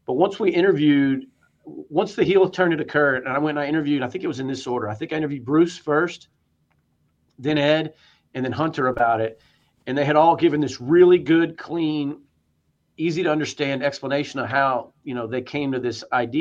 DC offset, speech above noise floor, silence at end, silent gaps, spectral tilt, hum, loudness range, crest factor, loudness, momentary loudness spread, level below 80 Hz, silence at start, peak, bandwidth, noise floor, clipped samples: under 0.1%; 47 dB; 0 s; none; -6.5 dB/octave; none; 5 LU; 20 dB; -21 LUFS; 11 LU; -60 dBFS; 0.1 s; -2 dBFS; 7.8 kHz; -68 dBFS; under 0.1%